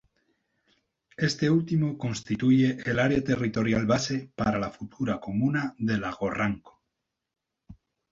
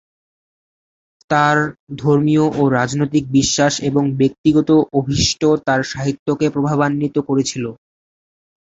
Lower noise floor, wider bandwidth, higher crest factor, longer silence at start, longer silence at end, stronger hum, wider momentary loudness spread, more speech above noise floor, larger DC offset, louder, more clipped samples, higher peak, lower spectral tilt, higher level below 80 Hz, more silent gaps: second, -83 dBFS vs under -90 dBFS; about the same, 7.8 kHz vs 8 kHz; about the same, 18 dB vs 16 dB; about the same, 1.2 s vs 1.3 s; second, 0.4 s vs 0.9 s; neither; about the same, 8 LU vs 7 LU; second, 57 dB vs over 74 dB; neither; second, -27 LUFS vs -16 LUFS; neither; second, -10 dBFS vs -2 dBFS; about the same, -6 dB/octave vs -5 dB/octave; second, -54 dBFS vs -44 dBFS; second, none vs 1.79-1.87 s, 4.38-4.44 s, 6.19-6.26 s